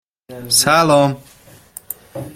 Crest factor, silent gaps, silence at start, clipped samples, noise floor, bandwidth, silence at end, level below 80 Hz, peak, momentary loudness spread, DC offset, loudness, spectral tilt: 18 dB; none; 0.3 s; under 0.1%; -40 dBFS; 16.5 kHz; 0.05 s; -54 dBFS; 0 dBFS; 20 LU; under 0.1%; -13 LUFS; -3.5 dB/octave